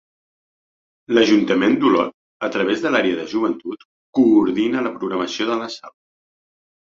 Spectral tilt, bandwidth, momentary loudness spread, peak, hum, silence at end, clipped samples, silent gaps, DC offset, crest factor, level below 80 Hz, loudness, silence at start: -5 dB/octave; 7.4 kHz; 13 LU; -2 dBFS; none; 0.95 s; under 0.1%; 2.14-2.40 s, 3.85-4.13 s; under 0.1%; 18 dB; -60 dBFS; -19 LUFS; 1.1 s